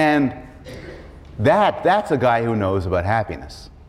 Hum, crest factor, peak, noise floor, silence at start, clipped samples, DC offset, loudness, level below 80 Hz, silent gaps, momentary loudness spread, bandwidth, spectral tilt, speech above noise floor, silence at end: none; 14 dB; -6 dBFS; -38 dBFS; 0 s; under 0.1%; under 0.1%; -19 LUFS; -42 dBFS; none; 22 LU; 13 kHz; -7 dB/octave; 20 dB; 0.2 s